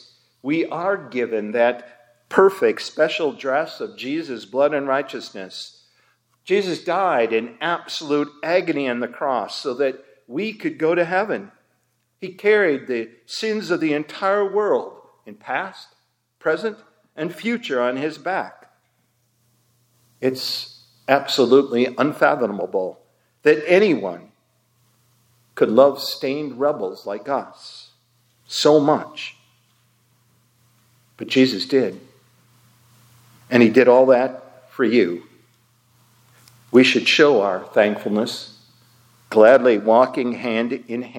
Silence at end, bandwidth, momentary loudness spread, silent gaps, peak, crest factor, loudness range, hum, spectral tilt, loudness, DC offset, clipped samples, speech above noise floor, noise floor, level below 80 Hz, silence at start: 0 s; 17 kHz; 17 LU; none; 0 dBFS; 20 dB; 7 LU; none; -5 dB/octave; -19 LUFS; under 0.1%; under 0.1%; 49 dB; -68 dBFS; -76 dBFS; 0.45 s